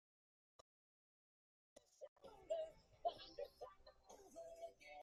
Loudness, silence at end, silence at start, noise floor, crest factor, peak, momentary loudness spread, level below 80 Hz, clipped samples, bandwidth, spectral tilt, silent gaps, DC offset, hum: -53 LUFS; 0 s; 1.75 s; under -90 dBFS; 24 dB; -32 dBFS; 16 LU; -80 dBFS; under 0.1%; 13.5 kHz; -3 dB/octave; 2.08-2.16 s; under 0.1%; none